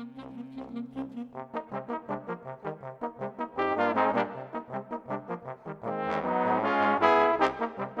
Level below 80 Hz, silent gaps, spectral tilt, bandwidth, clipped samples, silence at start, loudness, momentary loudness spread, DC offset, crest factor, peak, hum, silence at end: -66 dBFS; none; -7 dB/octave; 8.4 kHz; under 0.1%; 0 s; -30 LUFS; 16 LU; under 0.1%; 26 dB; -6 dBFS; none; 0 s